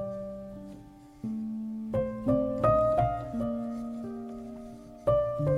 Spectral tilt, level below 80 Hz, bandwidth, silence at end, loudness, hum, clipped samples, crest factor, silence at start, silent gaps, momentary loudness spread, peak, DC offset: -9.5 dB/octave; -48 dBFS; 10.5 kHz; 0 s; -30 LUFS; none; under 0.1%; 18 dB; 0 s; none; 19 LU; -14 dBFS; under 0.1%